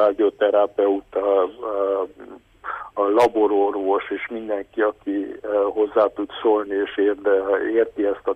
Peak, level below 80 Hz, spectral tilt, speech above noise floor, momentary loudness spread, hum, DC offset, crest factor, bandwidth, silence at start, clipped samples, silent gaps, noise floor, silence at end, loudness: -6 dBFS; -60 dBFS; -5.5 dB/octave; 20 dB; 9 LU; none; under 0.1%; 14 dB; 9.6 kHz; 0 s; under 0.1%; none; -41 dBFS; 0 s; -21 LUFS